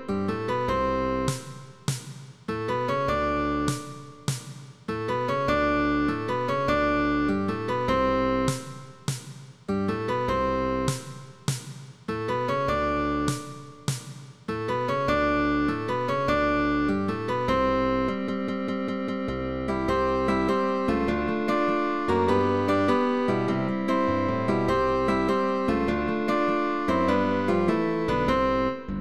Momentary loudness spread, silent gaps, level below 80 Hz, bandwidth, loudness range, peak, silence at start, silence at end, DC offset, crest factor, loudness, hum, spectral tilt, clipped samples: 11 LU; none; -44 dBFS; 14 kHz; 5 LU; -10 dBFS; 0 s; 0 s; 0.4%; 16 dB; -26 LUFS; none; -6 dB/octave; under 0.1%